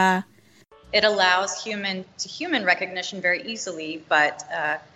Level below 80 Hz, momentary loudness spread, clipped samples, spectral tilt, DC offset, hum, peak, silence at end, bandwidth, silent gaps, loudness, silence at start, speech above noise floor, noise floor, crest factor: -64 dBFS; 11 LU; under 0.1%; -2.5 dB/octave; under 0.1%; none; -6 dBFS; 0.15 s; 14 kHz; none; -23 LUFS; 0 s; 31 dB; -54 dBFS; 18 dB